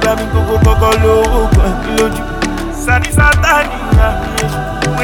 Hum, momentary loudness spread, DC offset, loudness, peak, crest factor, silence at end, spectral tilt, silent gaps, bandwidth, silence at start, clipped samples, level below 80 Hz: none; 8 LU; under 0.1%; -12 LUFS; 0 dBFS; 12 dB; 0 s; -5.5 dB/octave; none; 18.5 kHz; 0 s; under 0.1%; -16 dBFS